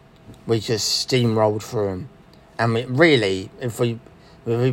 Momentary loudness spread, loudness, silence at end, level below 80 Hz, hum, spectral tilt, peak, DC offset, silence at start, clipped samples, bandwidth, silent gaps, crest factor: 19 LU; -21 LUFS; 0 s; -56 dBFS; none; -5 dB/octave; -2 dBFS; under 0.1%; 0.3 s; under 0.1%; 16.5 kHz; none; 20 dB